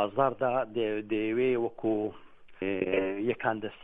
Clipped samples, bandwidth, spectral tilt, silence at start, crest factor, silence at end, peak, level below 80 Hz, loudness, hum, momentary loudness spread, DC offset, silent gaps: under 0.1%; 3.9 kHz; -9 dB/octave; 0 s; 20 dB; 0 s; -10 dBFS; -64 dBFS; -30 LUFS; none; 5 LU; under 0.1%; none